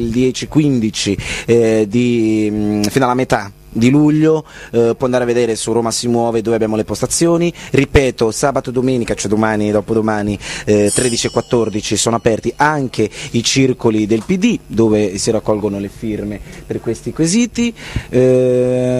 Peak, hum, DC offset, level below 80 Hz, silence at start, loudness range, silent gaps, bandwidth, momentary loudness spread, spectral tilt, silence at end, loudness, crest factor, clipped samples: 0 dBFS; none; under 0.1%; -36 dBFS; 0 s; 2 LU; none; 14.5 kHz; 7 LU; -5 dB/octave; 0 s; -15 LUFS; 14 dB; under 0.1%